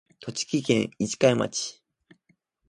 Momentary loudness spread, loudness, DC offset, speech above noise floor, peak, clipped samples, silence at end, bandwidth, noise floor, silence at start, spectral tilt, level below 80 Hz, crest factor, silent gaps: 11 LU; -26 LUFS; under 0.1%; 44 dB; -6 dBFS; under 0.1%; 1 s; 11.5 kHz; -69 dBFS; 0.2 s; -4.5 dB/octave; -64 dBFS; 22 dB; none